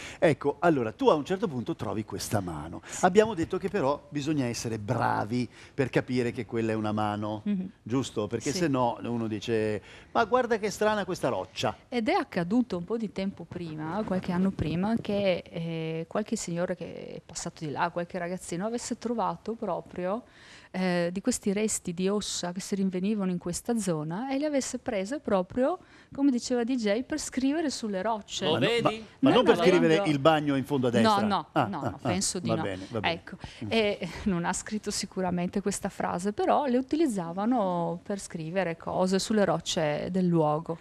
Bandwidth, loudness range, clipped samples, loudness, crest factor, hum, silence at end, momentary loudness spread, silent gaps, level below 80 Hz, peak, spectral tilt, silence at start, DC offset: 13.5 kHz; 7 LU; under 0.1%; -29 LUFS; 22 dB; none; 0.05 s; 9 LU; none; -58 dBFS; -6 dBFS; -5 dB/octave; 0 s; under 0.1%